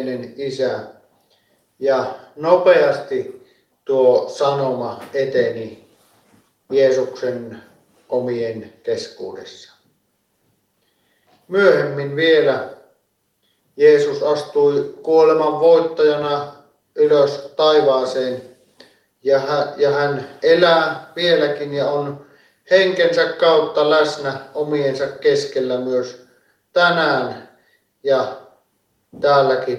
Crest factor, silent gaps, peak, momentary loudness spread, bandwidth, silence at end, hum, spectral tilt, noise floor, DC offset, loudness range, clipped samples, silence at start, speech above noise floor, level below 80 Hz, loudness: 18 dB; none; 0 dBFS; 15 LU; 11 kHz; 0 s; none; -5 dB/octave; -67 dBFS; under 0.1%; 6 LU; under 0.1%; 0 s; 50 dB; -66 dBFS; -17 LUFS